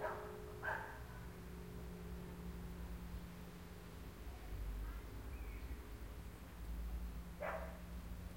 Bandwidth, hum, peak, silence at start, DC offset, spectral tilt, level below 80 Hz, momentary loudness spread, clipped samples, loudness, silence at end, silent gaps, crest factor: 16.5 kHz; none; -30 dBFS; 0 s; under 0.1%; -6 dB/octave; -52 dBFS; 8 LU; under 0.1%; -50 LUFS; 0 s; none; 18 dB